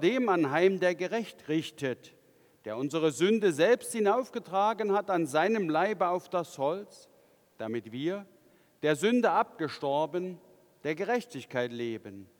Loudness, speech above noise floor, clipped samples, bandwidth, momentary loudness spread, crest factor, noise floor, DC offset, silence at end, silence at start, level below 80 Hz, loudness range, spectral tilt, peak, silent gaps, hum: -29 LUFS; 34 dB; under 0.1%; 19.5 kHz; 12 LU; 18 dB; -63 dBFS; under 0.1%; 0.15 s; 0 s; -84 dBFS; 5 LU; -5 dB/octave; -12 dBFS; none; none